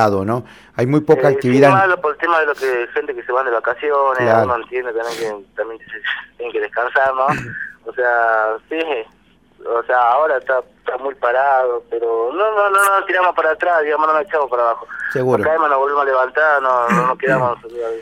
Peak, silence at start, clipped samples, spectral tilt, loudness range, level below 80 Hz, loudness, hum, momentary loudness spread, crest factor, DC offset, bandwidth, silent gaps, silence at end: 0 dBFS; 0 s; under 0.1%; -6 dB/octave; 4 LU; -56 dBFS; -17 LUFS; none; 11 LU; 16 dB; under 0.1%; 16.5 kHz; none; 0 s